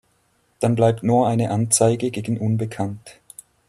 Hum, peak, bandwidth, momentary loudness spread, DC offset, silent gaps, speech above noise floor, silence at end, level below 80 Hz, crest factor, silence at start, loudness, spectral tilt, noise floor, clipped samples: none; -2 dBFS; 12.5 kHz; 12 LU; under 0.1%; none; 44 dB; 0.55 s; -56 dBFS; 20 dB; 0.6 s; -20 LUFS; -5.5 dB/octave; -64 dBFS; under 0.1%